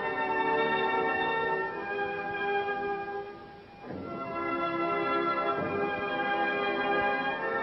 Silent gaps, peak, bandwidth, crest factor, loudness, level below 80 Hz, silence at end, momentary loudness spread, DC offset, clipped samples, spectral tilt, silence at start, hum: none; -16 dBFS; 6 kHz; 14 dB; -30 LUFS; -64 dBFS; 0 s; 11 LU; under 0.1%; under 0.1%; -7.5 dB/octave; 0 s; none